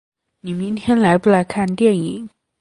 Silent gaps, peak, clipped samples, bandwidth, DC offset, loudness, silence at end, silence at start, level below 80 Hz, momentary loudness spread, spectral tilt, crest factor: none; 0 dBFS; under 0.1%; 11.5 kHz; under 0.1%; -17 LUFS; 0.35 s; 0.45 s; -52 dBFS; 17 LU; -7 dB/octave; 16 dB